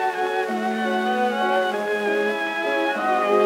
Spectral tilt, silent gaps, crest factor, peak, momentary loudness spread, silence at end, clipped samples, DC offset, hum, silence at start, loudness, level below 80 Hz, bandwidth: -4.5 dB/octave; none; 14 dB; -8 dBFS; 3 LU; 0 s; under 0.1%; under 0.1%; none; 0 s; -22 LUFS; -84 dBFS; 16 kHz